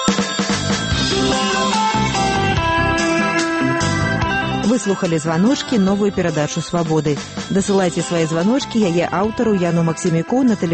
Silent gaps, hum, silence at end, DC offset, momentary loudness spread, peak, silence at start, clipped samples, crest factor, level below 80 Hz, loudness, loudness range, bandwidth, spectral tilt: none; none; 0 s; under 0.1%; 3 LU; 0 dBFS; 0 s; under 0.1%; 18 dB; -36 dBFS; -17 LUFS; 1 LU; 8.8 kHz; -5 dB/octave